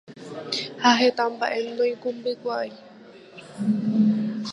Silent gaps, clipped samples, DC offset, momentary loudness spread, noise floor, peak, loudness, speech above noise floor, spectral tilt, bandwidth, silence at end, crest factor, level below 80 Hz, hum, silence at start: none; under 0.1%; under 0.1%; 18 LU; -46 dBFS; -4 dBFS; -24 LUFS; 23 dB; -5 dB/octave; 11 kHz; 0 s; 20 dB; -72 dBFS; none; 0.1 s